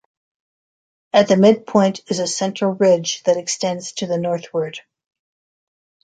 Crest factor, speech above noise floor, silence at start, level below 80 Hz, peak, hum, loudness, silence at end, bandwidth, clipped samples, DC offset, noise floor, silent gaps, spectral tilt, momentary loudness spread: 18 dB; over 72 dB; 1.15 s; -64 dBFS; -2 dBFS; none; -18 LUFS; 1.25 s; 9.4 kHz; under 0.1%; under 0.1%; under -90 dBFS; none; -4.5 dB/octave; 11 LU